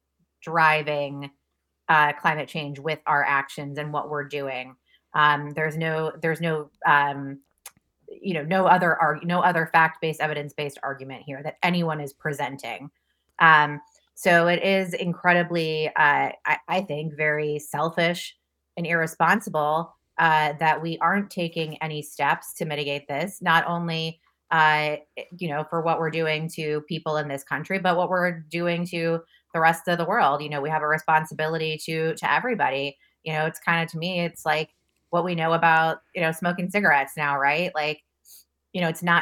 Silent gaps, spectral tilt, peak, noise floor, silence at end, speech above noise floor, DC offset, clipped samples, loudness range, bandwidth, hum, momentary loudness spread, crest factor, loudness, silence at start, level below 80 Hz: none; -5 dB/octave; 0 dBFS; -77 dBFS; 0 s; 53 dB; under 0.1%; under 0.1%; 4 LU; 18 kHz; none; 13 LU; 24 dB; -23 LUFS; 0.4 s; -72 dBFS